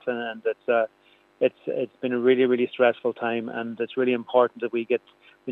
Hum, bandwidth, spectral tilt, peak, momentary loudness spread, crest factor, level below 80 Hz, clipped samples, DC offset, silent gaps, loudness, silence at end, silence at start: none; 4 kHz; -8 dB/octave; -6 dBFS; 9 LU; 18 dB; -82 dBFS; under 0.1%; under 0.1%; none; -25 LUFS; 0 s; 0.05 s